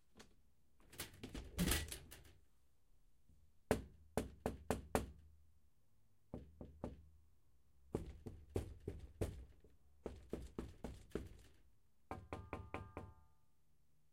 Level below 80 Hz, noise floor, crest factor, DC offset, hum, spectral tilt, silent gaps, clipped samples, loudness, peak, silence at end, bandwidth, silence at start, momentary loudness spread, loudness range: -58 dBFS; -80 dBFS; 30 dB; under 0.1%; none; -4.5 dB/octave; none; under 0.1%; -48 LUFS; -20 dBFS; 0.9 s; 16 kHz; 0.15 s; 18 LU; 8 LU